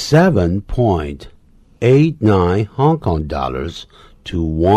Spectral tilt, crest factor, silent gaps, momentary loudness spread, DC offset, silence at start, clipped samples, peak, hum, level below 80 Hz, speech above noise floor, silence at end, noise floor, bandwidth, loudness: -7.5 dB/octave; 14 dB; none; 15 LU; under 0.1%; 0 s; under 0.1%; -2 dBFS; none; -32 dBFS; 28 dB; 0 s; -42 dBFS; 13 kHz; -16 LUFS